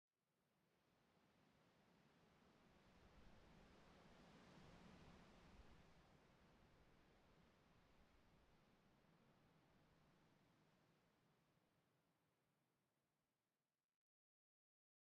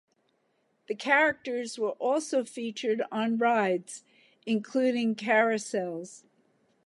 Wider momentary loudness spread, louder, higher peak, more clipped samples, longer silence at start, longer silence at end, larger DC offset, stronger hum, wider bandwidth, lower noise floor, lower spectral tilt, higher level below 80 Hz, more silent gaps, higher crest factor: second, 2 LU vs 14 LU; second, -68 LUFS vs -28 LUFS; second, -56 dBFS vs -10 dBFS; neither; second, 0.15 s vs 0.9 s; first, 1.45 s vs 0.7 s; neither; neither; second, 7.6 kHz vs 11.5 kHz; first, under -90 dBFS vs -73 dBFS; about the same, -4.5 dB/octave vs -4 dB/octave; about the same, -82 dBFS vs -78 dBFS; neither; about the same, 18 dB vs 20 dB